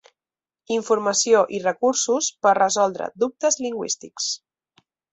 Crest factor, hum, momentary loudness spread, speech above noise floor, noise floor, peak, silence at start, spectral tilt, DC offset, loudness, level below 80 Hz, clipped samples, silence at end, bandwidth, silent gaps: 18 dB; none; 9 LU; over 69 dB; under -90 dBFS; -4 dBFS; 0.7 s; -2 dB/octave; under 0.1%; -21 LUFS; -70 dBFS; under 0.1%; 0.75 s; 8.4 kHz; none